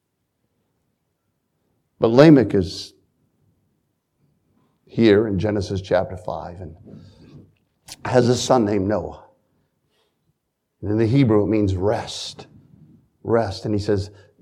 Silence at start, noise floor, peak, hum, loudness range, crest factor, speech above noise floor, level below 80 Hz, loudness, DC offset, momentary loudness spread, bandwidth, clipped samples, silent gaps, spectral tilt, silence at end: 2 s; -74 dBFS; 0 dBFS; none; 4 LU; 22 dB; 55 dB; -52 dBFS; -19 LUFS; under 0.1%; 19 LU; 12 kHz; under 0.1%; none; -6.5 dB/octave; 0.35 s